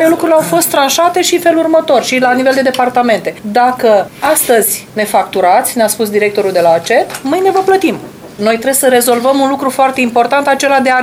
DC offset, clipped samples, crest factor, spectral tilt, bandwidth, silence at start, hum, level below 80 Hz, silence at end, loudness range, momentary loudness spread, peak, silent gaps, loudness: under 0.1%; under 0.1%; 10 dB; -3 dB/octave; 17.5 kHz; 0 s; none; -54 dBFS; 0 s; 1 LU; 4 LU; 0 dBFS; none; -10 LUFS